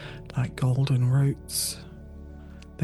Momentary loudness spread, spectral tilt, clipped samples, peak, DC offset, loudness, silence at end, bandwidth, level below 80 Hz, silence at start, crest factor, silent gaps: 22 LU; -5.5 dB/octave; under 0.1%; -14 dBFS; under 0.1%; -26 LUFS; 0 s; 12.5 kHz; -46 dBFS; 0 s; 14 dB; none